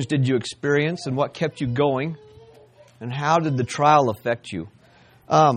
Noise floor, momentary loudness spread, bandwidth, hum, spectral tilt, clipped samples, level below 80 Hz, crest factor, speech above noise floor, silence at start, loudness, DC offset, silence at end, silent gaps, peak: -53 dBFS; 16 LU; 14.5 kHz; none; -6 dB/octave; under 0.1%; -58 dBFS; 18 dB; 32 dB; 0 s; -22 LUFS; under 0.1%; 0 s; none; -4 dBFS